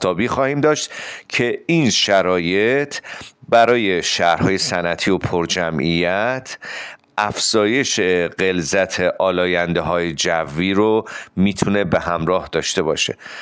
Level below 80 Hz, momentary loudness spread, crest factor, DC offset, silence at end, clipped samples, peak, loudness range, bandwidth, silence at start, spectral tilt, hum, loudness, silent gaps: -48 dBFS; 8 LU; 16 dB; under 0.1%; 0 s; under 0.1%; -4 dBFS; 2 LU; 10 kHz; 0 s; -4 dB/octave; none; -18 LUFS; none